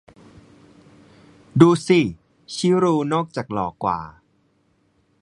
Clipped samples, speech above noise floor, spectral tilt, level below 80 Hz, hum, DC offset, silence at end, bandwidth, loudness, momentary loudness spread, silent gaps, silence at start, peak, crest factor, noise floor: under 0.1%; 45 dB; -6.5 dB/octave; -54 dBFS; none; under 0.1%; 1.1 s; 11 kHz; -20 LUFS; 12 LU; none; 1.55 s; 0 dBFS; 22 dB; -64 dBFS